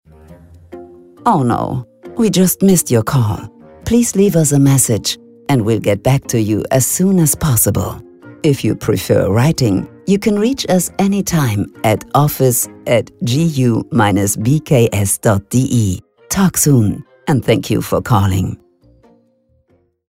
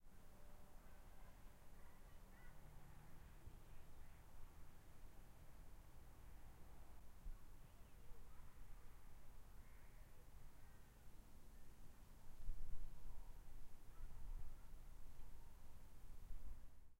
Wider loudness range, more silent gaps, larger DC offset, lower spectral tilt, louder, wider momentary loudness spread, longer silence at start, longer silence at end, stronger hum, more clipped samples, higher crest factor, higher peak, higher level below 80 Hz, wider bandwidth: second, 2 LU vs 5 LU; neither; neither; about the same, -5.5 dB/octave vs -5 dB/octave; first, -14 LUFS vs -66 LUFS; about the same, 8 LU vs 7 LU; first, 0.3 s vs 0 s; first, 1.55 s vs 0.05 s; neither; neither; about the same, 14 dB vs 18 dB; first, 0 dBFS vs -32 dBFS; first, -40 dBFS vs -58 dBFS; about the same, 16.5 kHz vs 16 kHz